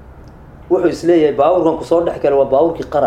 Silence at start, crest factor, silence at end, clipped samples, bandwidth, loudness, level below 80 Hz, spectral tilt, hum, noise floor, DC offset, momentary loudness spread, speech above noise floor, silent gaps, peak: 0 s; 14 dB; 0 s; under 0.1%; 10 kHz; -14 LUFS; -42 dBFS; -7 dB/octave; none; -37 dBFS; under 0.1%; 4 LU; 24 dB; none; 0 dBFS